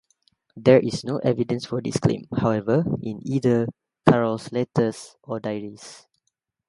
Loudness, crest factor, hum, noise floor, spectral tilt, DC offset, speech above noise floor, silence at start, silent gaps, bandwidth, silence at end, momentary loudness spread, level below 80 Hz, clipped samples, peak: -23 LUFS; 24 dB; none; -76 dBFS; -7 dB/octave; under 0.1%; 53 dB; 0.55 s; none; 11.5 kHz; 0.7 s; 14 LU; -54 dBFS; under 0.1%; 0 dBFS